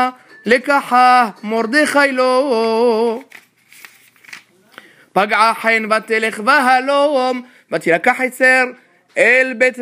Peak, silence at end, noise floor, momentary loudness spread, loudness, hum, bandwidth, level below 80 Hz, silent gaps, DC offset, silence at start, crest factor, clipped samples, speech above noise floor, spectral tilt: 0 dBFS; 0 s; -44 dBFS; 9 LU; -14 LUFS; none; 15.5 kHz; -66 dBFS; none; under 0.1%; 0 s; 16 dB; under 0.1%; 30 dB; -3.5 dB/octave